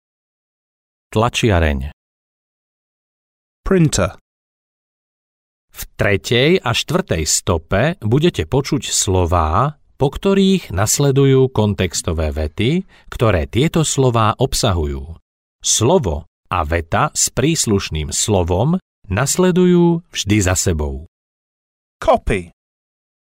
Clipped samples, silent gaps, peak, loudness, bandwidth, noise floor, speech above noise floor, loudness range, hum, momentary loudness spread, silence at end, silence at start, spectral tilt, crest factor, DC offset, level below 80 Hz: under 0.1%; 1.93-3.63 s, 4.21-5.68 s, 15.22-15.59 s, 16.28-16.43 s, 18.82-19.02 s, 21.08-22.00 s; -4 dBFS; -16 LUFS; 16 kHz; under -90 dBFS; over 74 dB; 6 LU; none; 9 LU; 0.8 s; 1.1 s; -4.5 dB/octave; 14 dB; under 0.1%; -32 dBFS